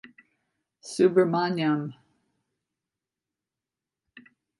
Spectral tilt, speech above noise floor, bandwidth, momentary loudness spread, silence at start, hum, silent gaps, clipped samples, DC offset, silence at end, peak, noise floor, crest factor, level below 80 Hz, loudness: -6.5 dB/octave; 66 dB; 11.5 kHz; 18 LU; 0.85 s; none; none; under 0.1%; under 0.1%; 0.4 s; -8 dBFS; -89 dBFS; 22 dB; -78 dBFS; -24 LUFS